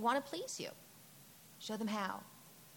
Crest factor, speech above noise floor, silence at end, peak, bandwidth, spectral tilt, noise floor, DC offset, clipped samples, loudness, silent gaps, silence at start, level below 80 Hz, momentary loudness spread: 20 dB; 20 dB; 0 s; -22 dBFS; 17.5 kHz; -3.5 dB/octave; -60 dBFS; under 0.1%; under 0.1%; -42 LUFS; none; 0 s; -86 dBFS; 19 LU